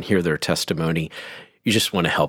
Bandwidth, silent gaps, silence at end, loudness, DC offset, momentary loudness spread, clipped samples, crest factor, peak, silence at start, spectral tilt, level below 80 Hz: 18 kHz; none; 0 s; -22 LUFS; under 0.1%; 13 LU; under 0.1%; 18 dB; -4 dBFS; 0 s; -4.5 dB/octave; -50 dBFS